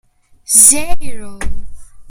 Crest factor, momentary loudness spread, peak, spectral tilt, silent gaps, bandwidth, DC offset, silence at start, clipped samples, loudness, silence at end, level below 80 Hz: 12 dB; 23 LU; 0 dBFS; -1 dB/octave; none; over 20 kHz; under 0.1%; 0.5 s; 0.7%; -7 LUFS; 0 s; -30 dBFS